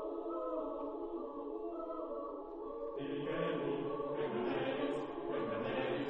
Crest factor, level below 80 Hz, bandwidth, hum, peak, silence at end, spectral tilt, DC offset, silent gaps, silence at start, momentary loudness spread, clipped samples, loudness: 14 dB; -64 dBFS; 8 kHz; none; -26 dBFS; 0 s; -4.5 dB/octave; under 0.1%; none; 0 s; 7 LU; under 0.1%; -40 LUFS